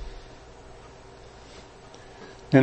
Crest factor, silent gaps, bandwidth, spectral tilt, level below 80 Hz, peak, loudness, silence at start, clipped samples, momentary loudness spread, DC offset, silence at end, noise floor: 26 dB; none; 8.4 kHz; -7.5 dB/octave; -50 dBFS; -4 dBFS; -29 LUFS; 0 s; under 0.1%; 4 LU; under 0.1%; 0 s; -47 dBFS